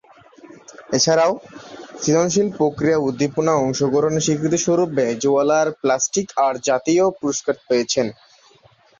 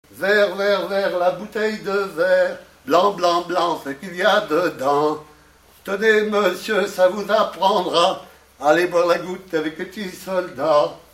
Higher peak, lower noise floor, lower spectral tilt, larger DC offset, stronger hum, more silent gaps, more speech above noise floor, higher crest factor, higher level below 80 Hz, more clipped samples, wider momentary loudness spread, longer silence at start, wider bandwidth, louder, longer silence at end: about the same, -4 dBFS vs -2 dBFS; about the same, -53 dBFS vs -51 dBFS; about the same, -4.5 dB/octave vs -4 dB/octave; neither; neither; neither; about the same, 35 dB vs 32 dB; about the same, 16 dB vs 18 dB; about the same, -56 dBFS vs -60 dBFS; neither; second, 7 LU vs 10 LU; first, 0.45 s vs 0.15 s; second, 7.6 kHz vs 16 kHz; about the same, -19 LUFS vs -19 LUFS; first, 0.85 s vs 0.15 s